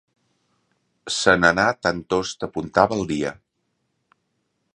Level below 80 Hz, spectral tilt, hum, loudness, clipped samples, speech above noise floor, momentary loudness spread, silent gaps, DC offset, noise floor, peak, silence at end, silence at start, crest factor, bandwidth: -50 dBFS; -4 dB/octave; none; -21 LUFS; under 0.1%; 53 dB; 13 LU; none; under 0.1%; -73 dBFS; 0 dBFS; 1.4 s; 1.05 s; 24 dB; 11.5 kHz